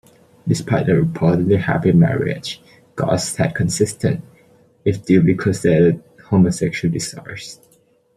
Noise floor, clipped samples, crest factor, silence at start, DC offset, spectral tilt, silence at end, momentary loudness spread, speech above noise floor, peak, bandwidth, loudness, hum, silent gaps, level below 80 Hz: -57 dBFS; under 0.1%; 16 dB; 0.45 s; under 0.1%; -6.5 dB/octave; 0.6 s; 15 LU; 40 dB; -2 dBFS; 13 kHz; -18 LUFS; none; none; -48 dBFS